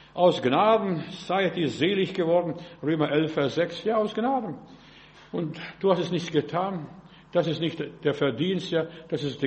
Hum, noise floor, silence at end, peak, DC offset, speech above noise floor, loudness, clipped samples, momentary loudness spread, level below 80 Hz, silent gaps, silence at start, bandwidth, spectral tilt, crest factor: none; -51 dBFS; 0 s; -8 dBFS; under 0.1%; 25 dB; -26 LUFS; under 0.1%; 10 LU; -64 dBFS; none; 0.15 s; 8.4 kHz; -6.5 dB/octave; 18 dB